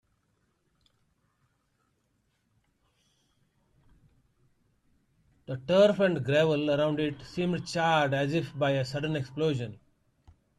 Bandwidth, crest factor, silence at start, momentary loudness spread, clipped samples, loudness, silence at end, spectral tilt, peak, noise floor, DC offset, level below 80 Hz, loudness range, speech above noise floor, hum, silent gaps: 12 kHz; 20 dB; 5.5 s; 10 LU; under 0.1%; -28 LUFS; 0.85 s; -6.5 dB/octave; -12 dBFS; -74 dBFS; under 0.1%; -64 dBFS; 4 LU; 47 dB; none; none